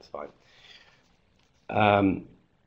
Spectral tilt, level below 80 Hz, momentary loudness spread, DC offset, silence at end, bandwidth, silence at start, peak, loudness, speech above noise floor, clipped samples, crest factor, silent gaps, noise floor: -8 dB/octave; -58 dBFS; 20 LU; under 0.1%; 0.45 s; 6.6 kHz; 0.15 s; -4 dBFS; -25 LUFS; 39 dB; under 0.1%; 24 dB; none; -66 dBFS